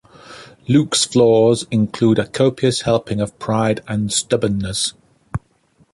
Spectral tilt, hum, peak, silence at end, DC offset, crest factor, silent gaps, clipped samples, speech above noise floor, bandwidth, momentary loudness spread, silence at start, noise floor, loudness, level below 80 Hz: -5 dB/octave; none; -2 dBFS; 0.55 s; under 0.1%; 16 dB; none; under 0.1%; 41 dB; 11.5 kHz; 11 LU; 0.3 s; -57 dBFS; -17 LUFS; -46 dBFS